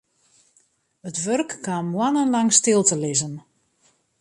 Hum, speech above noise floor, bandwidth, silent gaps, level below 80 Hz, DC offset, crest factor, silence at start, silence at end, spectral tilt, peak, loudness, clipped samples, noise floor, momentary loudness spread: none; 43 dB; 11.5 kHz; none; -68 dBFS; under 0.1%; 22 dB; 1.05 s; 0.8 s; -3.5 dB/octave; -2 dBFS; -20 LUFS; under 0.1%; -64 dBFS; 16 LU